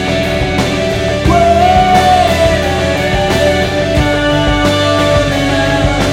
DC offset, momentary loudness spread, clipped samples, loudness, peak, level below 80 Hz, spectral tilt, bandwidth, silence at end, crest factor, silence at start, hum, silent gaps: under 0.1%; 5 LU; under 0.1%; -11 LUFS; 0 dBFS; -22 dBFS; -5 dB/octave; 16.5 kHz; 0 s; 10 dB; 0 s; none; none